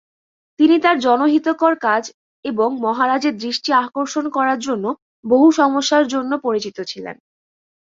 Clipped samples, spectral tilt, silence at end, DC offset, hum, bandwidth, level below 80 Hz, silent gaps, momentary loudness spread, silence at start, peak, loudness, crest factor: under 0.1%; -3.5 dB/octave; 0.7 s; under 0.1%; none; 7.6 kHz; -64 dBFS; 2.14-2.43 s, 5.02-5.23 s; 14 LU; 0.6 s; 0 dBFS; -17 LUFS; 18 dB